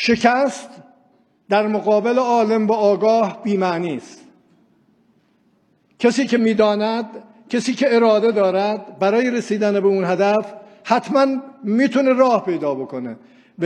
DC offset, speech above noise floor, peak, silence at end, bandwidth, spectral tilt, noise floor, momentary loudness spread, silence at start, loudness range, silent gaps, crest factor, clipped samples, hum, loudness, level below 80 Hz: under 0.1%; 43 dB; 0 dBFS; 0 s; 10 kHz; -5.5 dB/octave; -60 dBFS; 11 LU; 0 s; 4 LU; none; 18 dB; under 0.1%; none; -18 LUFS; -66 dBFS